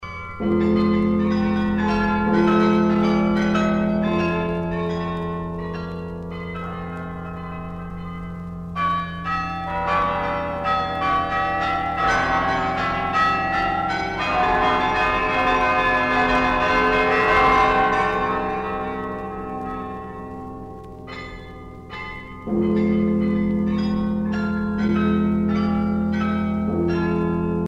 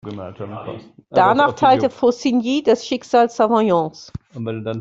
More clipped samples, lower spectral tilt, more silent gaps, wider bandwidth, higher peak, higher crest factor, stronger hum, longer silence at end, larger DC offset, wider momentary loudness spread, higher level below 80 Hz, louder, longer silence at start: neither; about the same, -7 dB/octave vs -6 dB/octave; neither; about the same, 8.2 kHz vs 7.8 kHz; second, -6 dBFS vs -2 dBFS; about the same, 16 dB vs 16 dB; neither; about the same, 0 s vs 0 s; neither; about the same, 15 LU vs 17 LU; first, -40 dBFS vs -56 dBFS; second, -21 LUFS vs -17 LUFS; about the same, 0 s vs 0.05 s